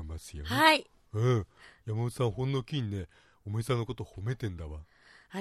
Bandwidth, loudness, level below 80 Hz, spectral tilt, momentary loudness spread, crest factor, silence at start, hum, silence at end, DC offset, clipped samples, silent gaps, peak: 14 kHz; -31 LUFS; -54 dBFS; -5.5 dB/octave; 21 LU; 26 dB; 0 s; none; 0 s; under 0.1%; under 0.1%; none; -6 dBFS